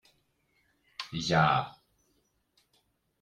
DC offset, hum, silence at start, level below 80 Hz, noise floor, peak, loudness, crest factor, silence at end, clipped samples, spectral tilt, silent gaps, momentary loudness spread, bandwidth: under 0.1%; none; 1 s; -62 dBFS; -74 dBFS; -12 dBFS; -28 LUFS; 22 dB; 1.5 s; under 0.1%; -5 dB/octave; none; 19 LU; 9.8 kHz